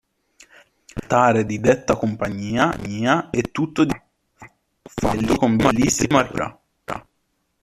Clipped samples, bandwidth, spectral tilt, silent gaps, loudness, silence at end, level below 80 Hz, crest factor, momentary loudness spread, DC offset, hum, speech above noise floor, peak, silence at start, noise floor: under 0.1%; 14.5 kHz; -5 dB/octave; none; -20 LUFS; 0.6 s; -44 dBFS; 18 dB; 16 LU; under 0.1%; none; 51 dB; -2 dBFS; 0.95 s; -70 dBFS